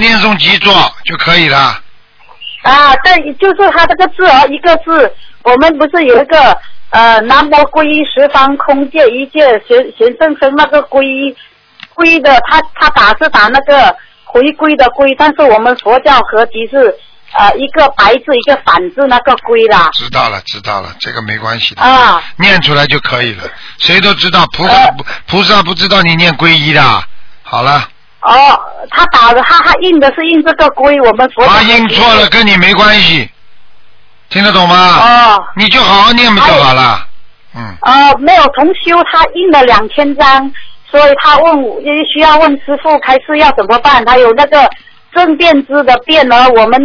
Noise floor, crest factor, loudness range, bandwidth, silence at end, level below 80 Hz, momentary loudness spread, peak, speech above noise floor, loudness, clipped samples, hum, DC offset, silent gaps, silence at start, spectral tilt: -44 dBFS; 6 dB; 3 LU; 5.4 kHz; 0 s; -34 dBFS; 9 LU; 0 dBFS; 37 dB; -6 LUFS; 5%; none; under 0.1%; none; 0 s; -5 dB/octave